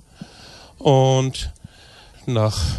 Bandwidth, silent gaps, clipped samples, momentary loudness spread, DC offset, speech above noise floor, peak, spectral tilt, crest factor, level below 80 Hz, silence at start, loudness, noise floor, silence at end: 12.5 kHz; none; under 0.1%; 25 LU; under 0.1%; 29 dB; -4 dBFS; -6 dB/octave; 18 dB; -36 dBFS; 0.2 s; -19 LUFS; -47 dBFS; 0 s